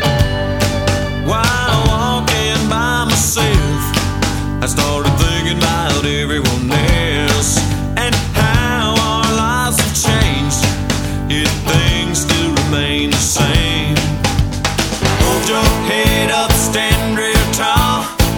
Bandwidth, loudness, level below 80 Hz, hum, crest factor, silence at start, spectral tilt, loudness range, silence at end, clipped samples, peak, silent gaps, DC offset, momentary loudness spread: over 20 kHz; -14 LUFS; -22 dBFS; none; 14 dB; 0 s; -4 dB/octave; 1 LU; 0 s; under 0.1%; 0 dBFS; none; under 0.1%; 4 LU